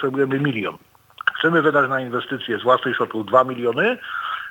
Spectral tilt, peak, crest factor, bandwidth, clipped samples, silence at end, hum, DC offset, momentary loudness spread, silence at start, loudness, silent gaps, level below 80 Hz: -7 dB/octave; -2 dBFS; 18 dB; 18.5 kHz; under 0.1%; 0 s; none; under 0.1%; 9 LU; 0 s; -20 LUFS; none; -70 dBFS